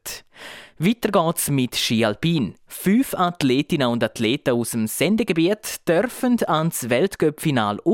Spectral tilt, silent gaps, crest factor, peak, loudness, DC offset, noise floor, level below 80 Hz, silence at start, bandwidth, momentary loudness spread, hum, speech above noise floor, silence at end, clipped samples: -5 dB/octave; none; 16 dB; -6 dBFS; -21 LUFS; under 0.1%; -41 dBFS; -54 dBFS; 0.05 s; 17 kHz; 5 LU; none; 20 dB; 0 s; under 0.1%